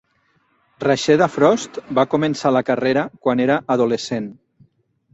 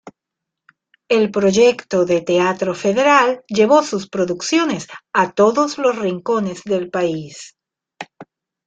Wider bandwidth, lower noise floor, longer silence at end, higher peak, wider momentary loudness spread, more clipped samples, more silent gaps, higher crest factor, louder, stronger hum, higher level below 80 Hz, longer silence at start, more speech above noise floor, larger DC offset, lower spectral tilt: second, 8.2 kHz vs 9.2 kHz; second, -63 dBFS vs -82 dBFS; first, 0.8 s vs 0.45 s; about the same, -2 dBFS vs -2 dBFS; second, 8 LU vs 14 LU; neither; neither; about the same, 18 dB vs 16 dB; about the same, -18 LUFS vs -17 LUFS; neither; about the same, -60 dBFS vs -60 dBFS; first, 0.8 s vs 0.05 s; second, 45 dB vs 65 dB; neither; about the same, -5.5 dB/octave vs -4.5 dB/octave